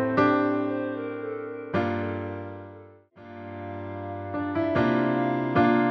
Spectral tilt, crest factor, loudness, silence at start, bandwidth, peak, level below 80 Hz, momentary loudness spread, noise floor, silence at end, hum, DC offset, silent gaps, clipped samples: -8.5 dB/octave; 18 dB; -27 LUFS; 0 s; 6.2 kHz; -8 dBFS; -60 dBFS; 18 LU; -49 dBFS; 0 s; none; under 0.1%; none; under 0.1%